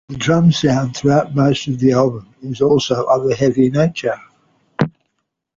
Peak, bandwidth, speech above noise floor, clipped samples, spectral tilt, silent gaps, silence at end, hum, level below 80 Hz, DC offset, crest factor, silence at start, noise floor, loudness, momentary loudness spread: -2 dBFS; 7.6 kHz; 57 dB; under 0.1%; -6.5 dB/octave; none; 0.7 s; none; -48 dBFS; under 0.1%; 14 dB; 0.1 s; -72 dBFS; -16 LUFS; 9 LU